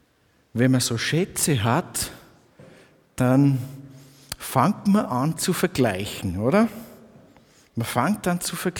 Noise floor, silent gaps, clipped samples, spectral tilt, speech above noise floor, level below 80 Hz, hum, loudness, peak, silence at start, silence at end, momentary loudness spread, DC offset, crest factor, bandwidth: -62 dBFS; none; under 0.1%; -5 dB/octave; 41 dB; -54 dBFS; none; -23 LUFS; -4 dBFS; 0.55 s; 0 s; 14 LU; under 0.1%; 20 dB; 20 kHz